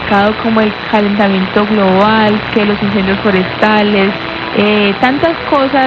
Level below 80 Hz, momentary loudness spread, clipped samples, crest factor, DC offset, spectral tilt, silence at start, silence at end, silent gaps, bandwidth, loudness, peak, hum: -40 dBFS; 4 LU; under 0.1%; 10 dB; under 0.1%; -7.5 dB/octave; 0 s; 0 s; none; 6.2 kHz; -11 LUFS; 0 dBFS; none